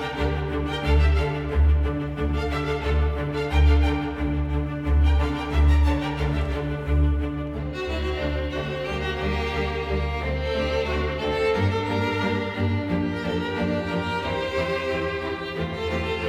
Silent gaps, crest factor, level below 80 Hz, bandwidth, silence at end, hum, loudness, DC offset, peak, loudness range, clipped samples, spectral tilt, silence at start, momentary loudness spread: none; 14 dB; -26 dBFS; 8 kHz; 0 s; none; -25 LUFS; under 0.1%; -10 dBFS; 4 LU; under 0.1%; -7 dB/octave; 0 s; 7 LU